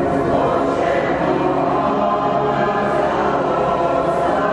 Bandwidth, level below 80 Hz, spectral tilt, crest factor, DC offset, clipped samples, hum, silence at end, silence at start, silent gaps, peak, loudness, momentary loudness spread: 11 kHz; -42 dBFS; -7 dB/octave; 12 dB; under 0.1%; under 0.1%; none; 0 s; 0 s; none; -6 dBFS; -18 LUFS; 1 LU